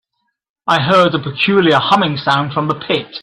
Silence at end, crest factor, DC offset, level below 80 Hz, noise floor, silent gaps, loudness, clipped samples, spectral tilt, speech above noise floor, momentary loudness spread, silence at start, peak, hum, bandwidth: 0.05 s; 14 dB; under 0.1%; -54 dBFS; -71 dBFS; none; -14 LUFS; under 0.1%; -6 dB/octave; 57 dB; 7 LU; 0.65 s; 0 dBFS; none; 12 kHz